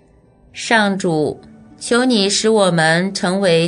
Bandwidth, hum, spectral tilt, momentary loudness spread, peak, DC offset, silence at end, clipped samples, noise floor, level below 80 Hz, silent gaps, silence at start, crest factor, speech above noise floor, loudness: 11 kHz; none; -4 dB/octave; 14 LU; 0 dBFS; under 0.1%; 0 s; under 0.1%; -50 dBFS; -54 dBFS; none; 0.55 s; 16 dB; 35 dB; -15 LUFS